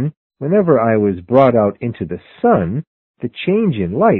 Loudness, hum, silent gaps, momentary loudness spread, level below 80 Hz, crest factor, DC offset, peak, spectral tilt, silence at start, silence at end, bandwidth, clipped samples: -16 LUFS; none; 0.17-0.30 s, 2.87-3.14 s; 14 LU; -44 dBFS; 16 dB; under 0.1%; 0 dBFS; -11 dB/octave; 0 s; 0 s; 4.2 kHz; under 0.1%